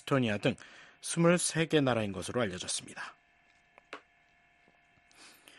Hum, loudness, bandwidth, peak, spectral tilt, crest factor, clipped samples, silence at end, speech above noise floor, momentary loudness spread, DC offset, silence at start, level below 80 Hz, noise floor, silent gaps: none; -31 LUFS; 12 kHz; -14 dBFS; -4.5 dB/octave; 20 dB; under 0.1%; 0.3 s; 36 dB; 23 LU; under 0.1%; 0.05 s; -68 dBFS; -67 dBFS; none